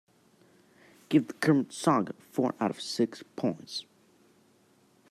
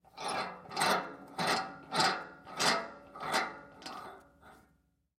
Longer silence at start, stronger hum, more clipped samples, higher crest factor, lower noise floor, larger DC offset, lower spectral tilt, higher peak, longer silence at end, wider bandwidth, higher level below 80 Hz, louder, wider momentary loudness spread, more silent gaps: first, 1.1 s vs 0.15 s; neither; neither; about the same, 20 dB vs 24 dB; second, -64 dBFS vs -73 dBFS; neither; first, -5.5 dB/octave vs -2 dB/octave; about the same, -12 dBFS vs -14 dBFS; first, 1.3 s vs 0.65 s; second, 14 kHz vs 16 kHz; second, -78 dBFS vs -72 dBFS; first, -30 LUFS vs -33 LUFS; second, 9 LU vs 16 LU; neither